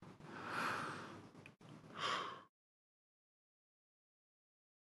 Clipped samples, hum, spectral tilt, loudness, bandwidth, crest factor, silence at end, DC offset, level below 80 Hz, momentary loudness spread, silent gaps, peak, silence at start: under 0.1%; none; -3.5 dB/octave; -45 LUFS; 11.5 kHz; 22 dB; 2.35 s; under 0.1%; -86 dBFS; 18 LU; none; -28 dBFS; 0 s